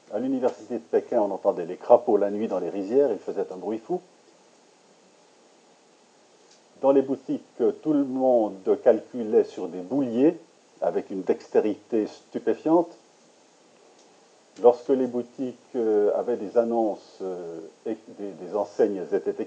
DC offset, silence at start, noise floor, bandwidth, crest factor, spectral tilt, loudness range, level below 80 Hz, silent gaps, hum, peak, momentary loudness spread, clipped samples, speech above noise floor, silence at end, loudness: under 0.1%; 0.1 s; -58 dBFS; 8.6 kHz; 22 dB; -7.5 dB/octave; 6 LU; under -90 dBFS; none; none; -2 dBFS; 13 LU; under 0.1%; 33 dB; 0 s; -25 LUFS